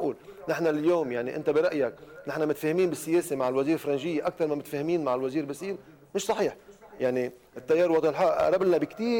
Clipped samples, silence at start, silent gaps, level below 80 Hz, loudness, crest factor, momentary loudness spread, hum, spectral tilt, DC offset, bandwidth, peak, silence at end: under 0.1%; 0 s; none; -64 dBFS; -27 LUFS; 12 dB; 11 LU; none; -5.5 dB/octave; under 0.1%; 17 kHz; -16 dBFS; 0 s